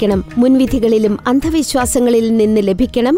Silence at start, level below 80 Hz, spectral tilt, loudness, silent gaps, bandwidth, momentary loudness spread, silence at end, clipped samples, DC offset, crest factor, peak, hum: 0 s; -32 dBFS; -5.5 dB/octave; -13 LUFS; none; 16 kHz; 3 LU; 0 s; under 0.1%; under 0.1%; 10 dB; -4 dBFS; none